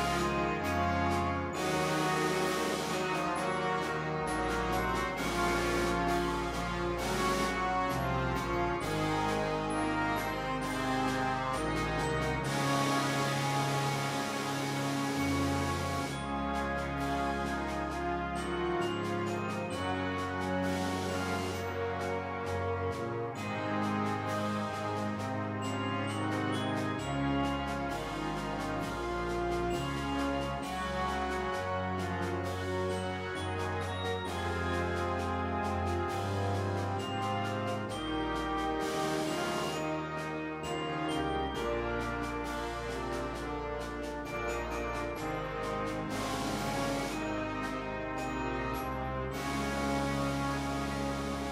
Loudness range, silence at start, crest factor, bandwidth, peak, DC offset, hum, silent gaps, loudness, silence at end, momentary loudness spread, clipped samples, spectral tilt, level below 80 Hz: 4 LU; 0 s; 14 dB; 16 kHz; -18 dBFS; under 0.1%; none; none; -33 LUFS; 0 s; 5 LU; under 0.1%; -5 dB/octave; -48 dBFS